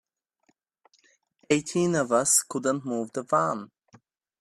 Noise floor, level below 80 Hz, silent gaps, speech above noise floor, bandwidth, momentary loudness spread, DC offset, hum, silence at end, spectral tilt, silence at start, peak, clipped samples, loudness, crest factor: -71 dBFS; -70 dBFS; none; 46 dB; 14 kHz; 10 LU; under 0.1%; none; 0.75 s; -3.5 dB/octave; 1.5 s; -8 dBFS; under 0.1%; -25 LUFS; 22 dB